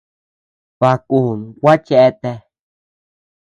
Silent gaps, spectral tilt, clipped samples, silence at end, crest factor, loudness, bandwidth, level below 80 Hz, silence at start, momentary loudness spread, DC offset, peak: none; -8 dB/octave; under 0.1%; 1.05 s; 16 dB; -14 LUFS; 9.4 kHz; -58 dBFS; 0.8 s; 15 LU; under 0.1%; 0 dBFS